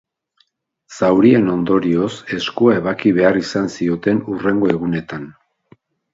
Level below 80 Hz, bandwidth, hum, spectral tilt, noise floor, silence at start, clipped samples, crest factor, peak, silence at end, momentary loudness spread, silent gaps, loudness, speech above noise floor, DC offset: -52 dBFS; 7.8 kHz; none; -6.5 dB/octave; -63 dBFS; 0.9 s; under 0.1%; 18 dB; 0 dBFS; 0.85 s; 10 LU; none; -16 LUFS; 47 dB; under 0.1%